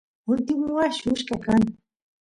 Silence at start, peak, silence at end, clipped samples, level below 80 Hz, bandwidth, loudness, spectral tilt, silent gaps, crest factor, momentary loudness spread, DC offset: 0.25 s; -10 dBFS; 0.5 s; under 0.1%; -52 dBFS; 11 kHz; -24 LUFS; -5.5 dB/octave; none; 16 dB; 5 LU; under 0.1%